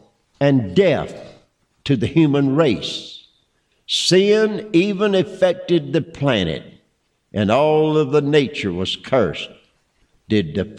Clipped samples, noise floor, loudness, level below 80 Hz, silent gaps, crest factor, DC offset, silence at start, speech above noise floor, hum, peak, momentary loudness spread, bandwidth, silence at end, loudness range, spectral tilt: under 0.1%; -66 dBFS; -18 LUFS; -52 dBFS; none; 14 dB; under 0.1%; 0.4 s; 48 dB; none; -4 dBFS; 13 LU; 11.5 kHz; 0 s; 2 LU; -6 dB/octave